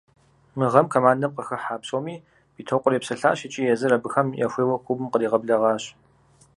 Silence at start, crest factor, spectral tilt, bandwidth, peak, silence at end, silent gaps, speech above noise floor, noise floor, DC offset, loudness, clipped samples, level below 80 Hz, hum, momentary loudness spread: 0.55 s; 22 dB; -6 dB/octave; 11.5 kHz; 0 dBFS; 0.7 s; none; 35 dB; -57 dBFS; under 0.1%; -23 LUFS; under 0.1%; -68 dBFS; none; 11 LU